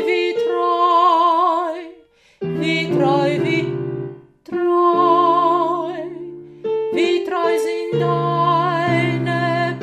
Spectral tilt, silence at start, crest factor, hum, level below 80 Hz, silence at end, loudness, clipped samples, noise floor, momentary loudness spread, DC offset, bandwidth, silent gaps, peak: -6.5 dB/octave; 0 s; 14 dB; none; -62 dBFS; 0 s; -18 LUFS; under 0.1%; -49 dBFS; 14 LU; under 0.1%; 12 kHz; none; -4 dBFS